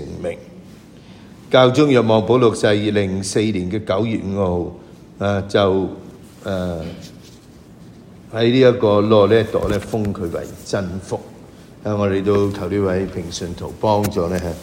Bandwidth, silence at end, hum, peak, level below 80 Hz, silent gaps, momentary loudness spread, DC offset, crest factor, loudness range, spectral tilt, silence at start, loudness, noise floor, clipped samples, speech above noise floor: 16 kHz; 0 s; none; 0 dBFS; -44 dBFS; none; 15 LU; under 0.1%; 18 dB; 6 LU; -6 dB/octave; 0 s; -18 LUFS; -42 dBFS; under 0.1%; 25 dB